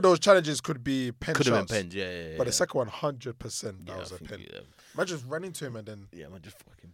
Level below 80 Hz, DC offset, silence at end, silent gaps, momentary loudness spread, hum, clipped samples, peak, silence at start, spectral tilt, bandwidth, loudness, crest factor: -58 dBFS; under 0.1%; 0.05 s; none; 22 LU; none; under 0.1%; -6 dBFS; 0 s; -4 dB/octave; 16.5 kHz; -28 LUFS; 22 dB